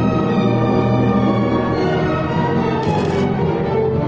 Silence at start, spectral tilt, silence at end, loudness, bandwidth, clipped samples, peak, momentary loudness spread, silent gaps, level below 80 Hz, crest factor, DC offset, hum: 0 s; -8.5 dB/octave; 0 s; -17 LUFS; 7.8 kHz; under 0.1%; -4 dBFS; 2 LU; none; -38 dBFS; 12 dB; under 0.1%; none